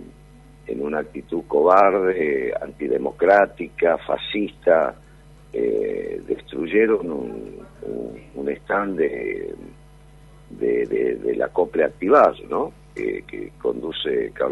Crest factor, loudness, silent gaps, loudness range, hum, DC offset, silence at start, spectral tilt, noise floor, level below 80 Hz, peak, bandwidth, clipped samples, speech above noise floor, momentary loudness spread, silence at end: 20 dB; -22 LUFS; none; 7 LU; none; under 0.1%; 0 s; -6.5 dB/octave; -47 dBFS; -50 dBFS; -2 dBFS; 10.5 kHz; under 0.1%; 26 dB; 16 LU; 0 s